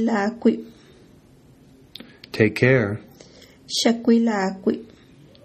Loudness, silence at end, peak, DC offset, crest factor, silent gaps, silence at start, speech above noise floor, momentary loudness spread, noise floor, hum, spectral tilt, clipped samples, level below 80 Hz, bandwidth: -21 LUFS; 0.6 s; -2 dBFS; under 0.1%; 20 dB; none; 0 s; 31 dB; 17 LU; -51 dBFS; none; -5.5 dB/octave; under 0.1%; -58 dBFS; 14 kHz